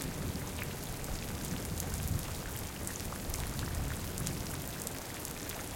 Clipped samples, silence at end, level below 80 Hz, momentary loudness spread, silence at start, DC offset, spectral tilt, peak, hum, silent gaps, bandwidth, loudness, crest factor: under 0.1%; 0 s; -46 dBFS; 3 LU; 0 s; under 0.1%; -4 dB/octave; -14 dBFS; none; none; 17 kHz; -38 LUFS; 24 dB